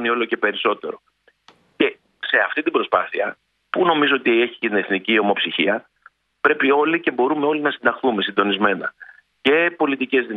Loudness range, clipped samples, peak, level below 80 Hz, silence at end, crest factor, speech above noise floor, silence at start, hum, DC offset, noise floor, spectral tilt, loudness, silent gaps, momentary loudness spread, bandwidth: 3 LU; under 0.1%; -2 dBFS; -68 dBFS; 0 s; 18 dB; 36 dB; 0 s; none; under 0.1%; -55 dBFS; -7 dB/octave; -19 LUFS; none; 9 LU; 4.8 kHz